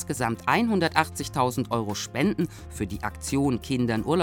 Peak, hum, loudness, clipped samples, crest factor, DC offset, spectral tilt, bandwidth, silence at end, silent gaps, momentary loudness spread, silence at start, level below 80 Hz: -4 dBFS; none; -26 LUFS; under 0.1%; 22 dB; under 0.1%; -5 dB/octave; 18 kHz; 0 s; none; 9 LU; 0 s; -48 dBFS